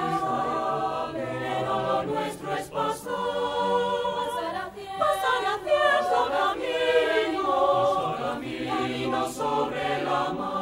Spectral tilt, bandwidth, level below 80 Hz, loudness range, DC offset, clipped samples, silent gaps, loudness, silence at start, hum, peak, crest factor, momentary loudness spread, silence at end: -4.5 dB/octave; 16 kHz; -58 dBFS; 4 LU; under 0.1%; under 0.1%; none; -26 LUFS; 0 s; none; -10 dBFS; 16 dB; 8 LU; 0 s